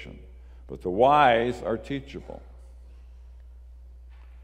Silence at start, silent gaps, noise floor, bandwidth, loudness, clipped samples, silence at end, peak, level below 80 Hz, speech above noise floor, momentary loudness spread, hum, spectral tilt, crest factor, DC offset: 0 s; none; -46 dBFS; 9.8 kHz; -23 LUFS; under 0.1%; 0 s; -6 dBFS; -46 dBFS; 22 dB; 25 LU; none; -6.5 dB/octave; 22 dB; under 0.1%